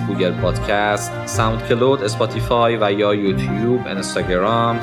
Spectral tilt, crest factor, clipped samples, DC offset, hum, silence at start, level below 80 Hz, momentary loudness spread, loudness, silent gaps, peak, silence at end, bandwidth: -5.5 dB/octave; 16 dB; under 0.1%; under 0.1%; none; 0 s; -36 dBFS; 4 LU; -18 LUFS; none; -2 dBFS; 0 s; 17 kHz